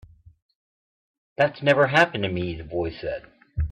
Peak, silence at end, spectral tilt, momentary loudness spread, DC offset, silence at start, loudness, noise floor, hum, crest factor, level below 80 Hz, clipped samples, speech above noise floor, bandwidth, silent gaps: -4 dBFS; 0 s; -6 dB/octave; 17 LU; under 0.1%; 1.4 s; -23 LUFS; under -90 dBFS; none; 20 dB; -42 dBFS; under 0.1%; over 67 dB; 11 kHz; none